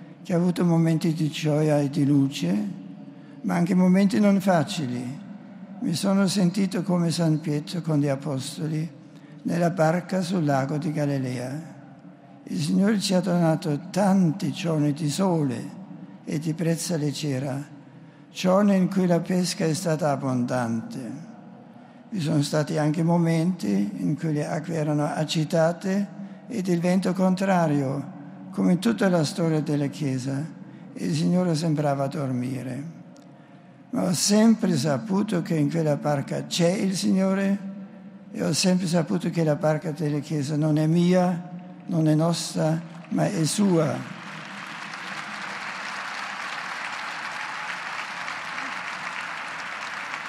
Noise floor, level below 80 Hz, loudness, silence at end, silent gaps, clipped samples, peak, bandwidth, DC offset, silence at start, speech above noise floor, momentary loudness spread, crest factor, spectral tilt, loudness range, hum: -48 dBFS; -74 dBFS; -25 LUFS; 0 s; none; under 0.1%; -8 dBFS; 15.5 kHz; under 0.1%; 0 s; 25 dB; 14 LU; 16 dB; -6 dB/octave; 4 LU; none